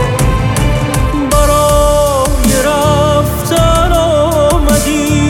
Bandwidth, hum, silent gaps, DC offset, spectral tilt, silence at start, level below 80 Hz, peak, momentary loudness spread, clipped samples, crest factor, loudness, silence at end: 17.5 kHz; none; none; under 0.1%; -5 dB/octave; 0 s; -16 dBFS; 0 dBFS; 4 LU; under 0.1%; 10 dB; -11 LUFS; 0 s